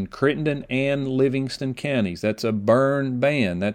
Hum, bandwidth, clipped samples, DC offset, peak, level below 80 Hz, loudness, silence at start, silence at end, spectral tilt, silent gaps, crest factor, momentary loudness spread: none; 16 kHz; under 0.1%; under 0.1%; -4 dBFS; -54 dBFS; -22 LUFS; 0 s; 0 s; -7 dB/octave; none; 18 dB; 6 LU